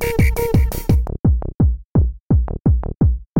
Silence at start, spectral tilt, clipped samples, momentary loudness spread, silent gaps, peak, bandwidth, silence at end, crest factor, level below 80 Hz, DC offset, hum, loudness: 0 s; -8 dB/octave; under 0.1%; 2 LU; 1.19-1.24 s, 1.54-1.59 s, 1.85-1.95 s, 2.20-2.30 s, 2.60-2.65 s, 3.26-3.36 s; -4 dBFS; 17 kHz; 0 s; 14 dB; -20 dBFS; under 0.1%; none; -19 LUFS